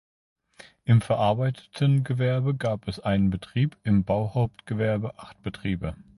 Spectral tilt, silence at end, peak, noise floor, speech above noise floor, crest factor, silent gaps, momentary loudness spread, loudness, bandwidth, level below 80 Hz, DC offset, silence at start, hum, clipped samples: -8 dB/octave; 0.15 s; -8 dBFS; -53 dBFS; 28 dB; 16 dB; none; 9 LU; -26 LUFS; 11.5 kHz; -48 dBFS; under 0.1%; 0.85 s; none; under 0.1%